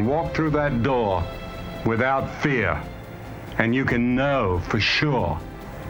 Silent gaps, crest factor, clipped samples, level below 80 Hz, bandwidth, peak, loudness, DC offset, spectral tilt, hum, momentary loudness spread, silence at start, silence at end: none; 22 dB; under 0.1%; -40 dBFS; 19 kHz; -2 dBFS; -23 LUFS; under 0.1%; -6.5 dB/octave; none; 14 LU; 0 s; 0 s